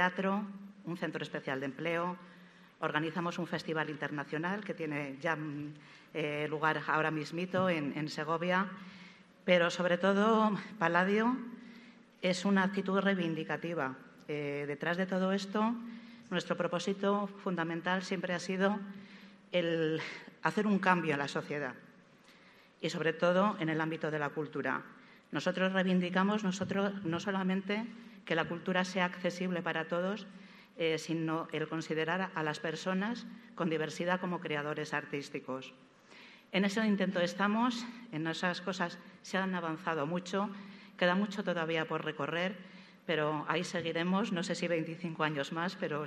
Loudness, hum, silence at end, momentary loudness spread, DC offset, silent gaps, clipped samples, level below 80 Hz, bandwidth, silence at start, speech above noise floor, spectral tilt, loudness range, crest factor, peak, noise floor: -34 LUFS; none; 0 s; 12 LU; under 0.1%; none; under 0.1%; -80 dBFS; 11 kHz; 0 s; 27 dB; -5.5 dB/octave; 5 LU; 24 dB; -10 dBFS; -61 dBFS